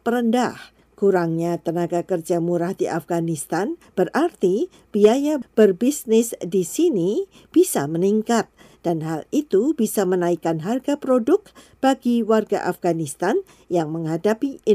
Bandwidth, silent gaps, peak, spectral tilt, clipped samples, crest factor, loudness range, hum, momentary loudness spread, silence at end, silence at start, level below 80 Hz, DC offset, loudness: 16 kHz; none; -4 dBFS; -6 dB/octave; under 0.1%; 18 dB; 3 LU; none; 7 LU; 0 s; 0.05 s; -62 dBFS; under 0.1%; -21 LUFS